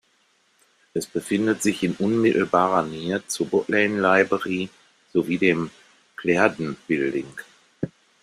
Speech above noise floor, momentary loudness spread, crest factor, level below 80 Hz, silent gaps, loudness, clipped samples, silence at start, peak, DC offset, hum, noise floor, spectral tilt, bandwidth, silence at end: 42 dB; 14 LU; 22 dB; -62 dBFS; none; -22 LUFS; under 0.1%; 0.95 s; -2 dBFS; under 0.1%; none; -64 dBFS; -5 dB/octave; 14.5 kHz; 0.35 s